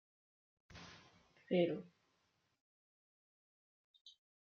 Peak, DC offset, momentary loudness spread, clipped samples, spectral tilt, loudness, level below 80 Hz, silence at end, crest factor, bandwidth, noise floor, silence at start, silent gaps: -22 dBFS; under 0.1%; 26 LU; under 0.1%; -6 dB/octave; -39 LUFS; -82 dBFS; 0.35 s; 24 dB; 7 kHz; -82 dBFS; 0.75 s; 2.60-3.94 s, 4.01-4.05 s